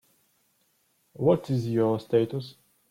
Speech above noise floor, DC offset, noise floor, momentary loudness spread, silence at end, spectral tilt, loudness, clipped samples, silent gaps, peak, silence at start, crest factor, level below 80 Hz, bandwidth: 45 dB; under 0.1%; -70 dBFS; 10 LU; 0.4 s; -8.5 dB/octave; -26 LUFS; under 0.1%; none; -10 dBFS; 1.2 s; 18 dB; -66 dBFS; 15.5 kHz